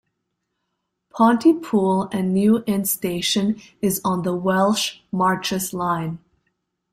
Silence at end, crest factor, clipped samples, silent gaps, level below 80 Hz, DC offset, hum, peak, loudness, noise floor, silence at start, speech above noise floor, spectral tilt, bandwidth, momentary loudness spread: 0.75 s; 16 dB; under 0.1%; none; -58 dBFS; under 0.1%; none; -4 dBFS; -20 LUFS; -77 dBFS; 1.15 s; 57 dB; -5 dB/octave; 16 kHz; 7 LU